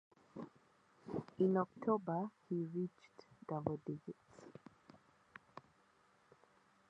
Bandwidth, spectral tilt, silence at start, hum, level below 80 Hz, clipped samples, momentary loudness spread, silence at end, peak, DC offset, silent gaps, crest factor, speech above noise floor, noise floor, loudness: 8 kHz; -9.5 dB/octave; 0.35 s; none; -78 dBFS; under 0.1%; 24 LU; 1.3 s; -20 dBFS; under 0.1%; none; 24 dB; 33 dB; -73 dBFS; -41 LUFS